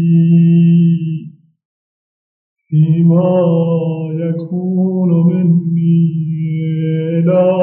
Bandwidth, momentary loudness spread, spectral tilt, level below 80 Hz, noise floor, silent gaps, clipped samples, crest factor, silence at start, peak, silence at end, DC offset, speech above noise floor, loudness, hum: 3.3 kHz; 9 LU; -11 dB/octave; -72 dBFS; under -90 dBFS; 1.65-2.56 s; under 0.1%; 12 dB; 0 s; -2 dBFS; 0 s; under 0.1%; over 79 dB; -13 LUFS; none